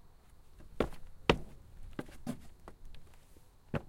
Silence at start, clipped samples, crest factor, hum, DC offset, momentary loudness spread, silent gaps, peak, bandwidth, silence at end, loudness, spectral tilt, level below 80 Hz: 0 s; under 0.1%; 36 dB; none; under 0.1%; 26 LU; none; -4 dBFS; 16.5 kHz; 0 s; -38 LUFS; -5.5 dB/octave; -50 dBFS